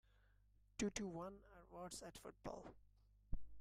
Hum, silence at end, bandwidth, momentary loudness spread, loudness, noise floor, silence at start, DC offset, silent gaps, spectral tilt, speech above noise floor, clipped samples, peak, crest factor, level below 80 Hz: 50 Hz at -70 dBFS; 0 s; 15 kHz; 14 LU; -51 LUFS; -74 dBFS; 0.8 s; under 0.1%; none; -4.5 dB/octave; 23 dB; under 0.1%; -30 dBFS; 20 dB; -60 dBFS